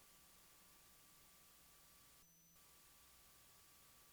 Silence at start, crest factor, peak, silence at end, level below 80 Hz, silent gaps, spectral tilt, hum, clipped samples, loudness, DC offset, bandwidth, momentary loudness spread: 0 s; 14 dB; -54 dBFS; 0 s; -82 dBFS; none; -1.5 dB/octave; none; under 0.1%; -65 LUFS; under 0.1%; over 20 kHz; 1 LU